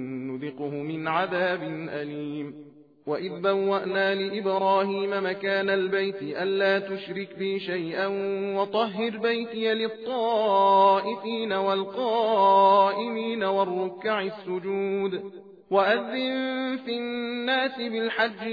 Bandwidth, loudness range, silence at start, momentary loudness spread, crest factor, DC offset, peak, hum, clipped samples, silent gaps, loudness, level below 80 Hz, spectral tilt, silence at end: 5 kHz; 6 LU; 0 s; 12 LU; 18 dB; under 0.1%; -8 dBFS; none; under 0.1%; none; -26 LUFS; -80 dBFS; -7.5 dB/octave; 0 s